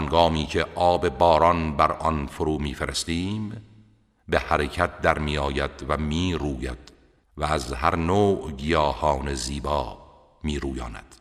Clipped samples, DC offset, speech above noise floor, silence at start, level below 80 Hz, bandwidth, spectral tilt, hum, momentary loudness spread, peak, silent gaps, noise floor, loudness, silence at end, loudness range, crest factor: under 0.1%; under 0.1%; 33 dB; 0 s; -36 dBFS; 14 kHz; -5.5 dB/octave; none; 11 LU; -2 dBFS; none; -57 dBFS; -24 LUFS; 0.05 s; 4 LU; 22 dB